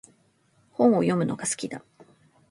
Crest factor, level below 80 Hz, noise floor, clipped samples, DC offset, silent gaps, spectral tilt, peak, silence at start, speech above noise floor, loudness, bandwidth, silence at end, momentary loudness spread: 20 dB; -70 dBFS; -65 dBFS; under 0.1%; under 0.1%; none; -5.5 dB/octave; -6 dBFS; 0.8 s; 41 dB; -24 LUFS; 11.5 kHz; 0.7 s; 19 LU